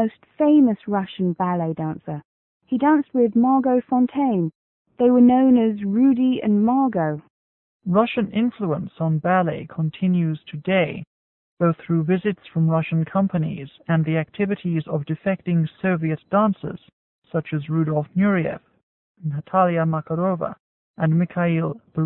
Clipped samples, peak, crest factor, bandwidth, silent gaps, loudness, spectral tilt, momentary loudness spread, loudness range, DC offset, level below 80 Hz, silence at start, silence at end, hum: under 0.1%; -6 dBFS; 16 dB; 4 kHz; 2.25-2.60 s, 4.55-4.85 s, 7.30-7.80 s, 11.07-11.57 s, 16.93-17.22 s, 18.83-19.15 s, 20.60-20.94 s; -21 LUFS; -13 dB/octave; 11 LU; 5 LU; under 0.1%; -60 dBFS; 0 s; 0 s; none